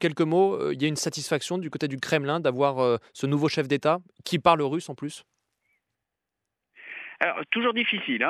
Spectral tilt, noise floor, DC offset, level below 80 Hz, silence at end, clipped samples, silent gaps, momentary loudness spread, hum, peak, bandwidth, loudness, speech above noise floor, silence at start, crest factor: -5 dB/octave; -85 dBFS; under 0.1%; -68 dBFS; 0 s; under 0.1%; none; 12 LU; none; -6 dBFS; 14 kHz; -25 LUFS; 60 dB; 0 s; 22 dB